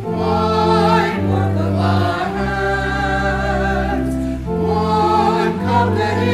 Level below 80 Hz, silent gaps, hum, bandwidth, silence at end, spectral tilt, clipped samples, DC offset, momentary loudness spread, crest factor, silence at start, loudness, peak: -30 dBFS; none; none; 14 kHz; 0 s; -7 dB/octave; under 0.1%; under 0.1%; 5 LU; 14 dB; 0 s; -17 LUFS; -2 dBFS